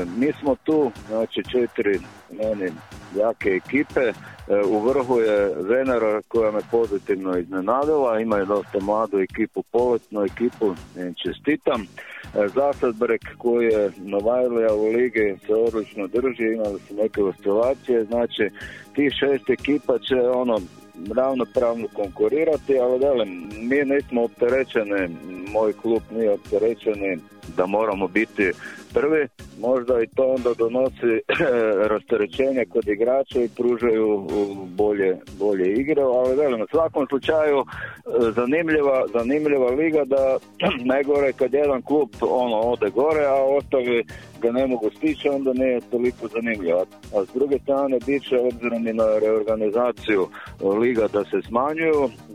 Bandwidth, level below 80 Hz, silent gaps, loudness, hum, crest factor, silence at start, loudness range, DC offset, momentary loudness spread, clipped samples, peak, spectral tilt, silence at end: 12.5 kHz; -50 dBFS; none; -22 LUFS; none; 16 dB; 0 s; 3 LU; under 0.1%; 7 LU; under 0.1%; -6 dBFS; -6.5 dB/octave; 0 s